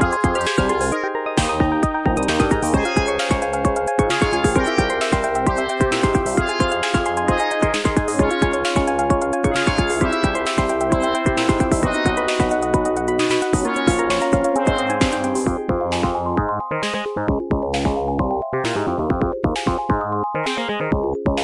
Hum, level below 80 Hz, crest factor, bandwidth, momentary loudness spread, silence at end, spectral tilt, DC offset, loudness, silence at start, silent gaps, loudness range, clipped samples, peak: none; -34 dBFS; 16 dB; 11.5 kHz; 4 LU; 0 s; -5 dB/octave; 0.1%; -20 LUFS; 0 s; none; 3 LU; under 0.1%; -2 dBFS